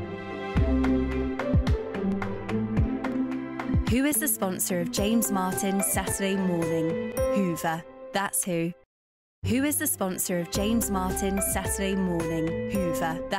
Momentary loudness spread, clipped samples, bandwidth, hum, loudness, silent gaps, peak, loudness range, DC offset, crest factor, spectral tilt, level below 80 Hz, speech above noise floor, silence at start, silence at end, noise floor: 6 LU; under 0.1%; 16 kHz; none; -27 LUFS; 8.86-9.42 s; -14 dBFS; 2 LU; under 0.1%; 14 dB; -5 dB/octave; -38 dBFS; over 63 dB; 0 s; 0 s; under -90 dBFS